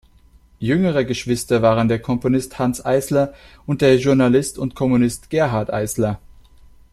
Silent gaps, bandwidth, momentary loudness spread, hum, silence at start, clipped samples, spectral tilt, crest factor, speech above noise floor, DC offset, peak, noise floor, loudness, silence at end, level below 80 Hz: none; 13.5 kHz; 9 LU; none; 0.6 s; under 0.1%; -6 dB/octave; 16 dB; 32 dB; under 0.1%; -2 dBFS; -50 dBFS; -19 LUFS; 0.75 s; -44 dBFS